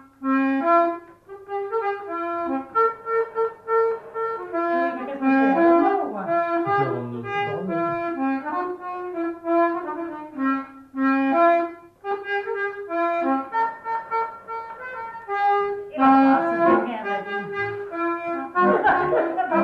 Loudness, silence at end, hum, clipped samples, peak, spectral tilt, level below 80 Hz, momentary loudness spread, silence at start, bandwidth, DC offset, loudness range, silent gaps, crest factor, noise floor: -23 LUFS; 0 s; none; under 0.1%; -8 dBFS; -8 dB/octave; -64 dBFS; 12 LU; 0.2 s; 5.6 kHz; under 0.1%; 4 LU; none; 16 dB; -43 dBFS